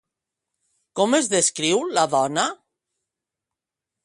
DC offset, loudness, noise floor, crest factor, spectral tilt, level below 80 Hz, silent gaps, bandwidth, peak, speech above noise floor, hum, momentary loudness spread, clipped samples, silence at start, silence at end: under 0.1%; -20 LUFS; -87 dBFS; 20 dB; -2.5 dB/octave; -68 dBFS; none; 11.5 kHz; -4 dBFS; 66 dB; none; 6 LU; under 0.1%; 0.95 s; 1.5 s